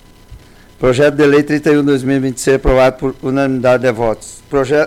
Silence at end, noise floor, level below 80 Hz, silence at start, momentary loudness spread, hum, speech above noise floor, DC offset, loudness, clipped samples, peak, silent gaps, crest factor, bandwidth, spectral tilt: 0 s; -38 dBFS; -30 dBFS; 0.3 s; 7 LU; none; 26 dB; under 0.1%; -13 LUFS; under 0.1%; -4 dBFS; none; 10 dB; 15.5 kHz; -6 dB/octave